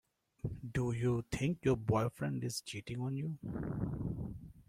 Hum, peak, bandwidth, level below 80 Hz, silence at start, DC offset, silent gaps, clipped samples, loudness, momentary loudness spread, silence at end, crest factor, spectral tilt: none; -18 dBFS; 15.5 kHz; -56 dBFS; 0.45 s; under 0.1%; none; under 0.1%; -38 LUFS; 10 LU; 0.05 s; 18 dB; -6.5 dB/octave